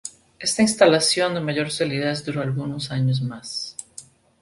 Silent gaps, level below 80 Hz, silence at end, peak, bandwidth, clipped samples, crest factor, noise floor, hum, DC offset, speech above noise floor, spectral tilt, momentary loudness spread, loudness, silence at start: none; -60 dBFS; 0.4 s; -2 dBFS; 11.5 kHz; under 0.1%; 22 dB; -46 dBFS; none; under 0.1%; 24 dB; -4.5 dB/octave; 17 LU; -22 LUFS; 0.05 s